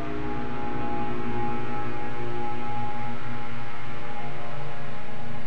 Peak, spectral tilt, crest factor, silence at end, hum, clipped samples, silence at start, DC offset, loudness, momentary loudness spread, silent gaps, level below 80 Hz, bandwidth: -14 dBFS; -7 dB/octave; 14 dB; 0 s; none; under 0.1%; 0 s; 10%; -34 LUFS; 6 LU; none; -48 dBFS; 9.8 kHz